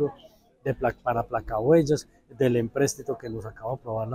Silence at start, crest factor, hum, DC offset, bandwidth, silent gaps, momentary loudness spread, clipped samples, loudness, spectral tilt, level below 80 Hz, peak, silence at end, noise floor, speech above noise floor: 0 s; 18 dB; none; under 0.1%; 15.5 kHz; none; 13 LU; under 0.1%; -27 LUFS; -6 dB/octave; -50 dBFS; -8 dBFS; 0 s; -54 dBFS; 28 dB